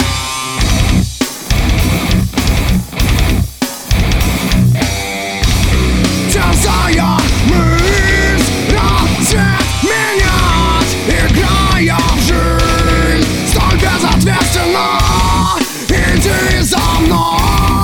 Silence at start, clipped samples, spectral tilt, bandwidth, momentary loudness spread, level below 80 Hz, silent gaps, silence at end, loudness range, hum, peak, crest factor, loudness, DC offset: 0 s; under 0.1%; -4.5 dB/octave; 19.5 kHz; 4 LU; -16 dBFS; none; 0 s; 3 LU; none; 0 dBFS; 10 dB; -12 LUFS; under 0.1%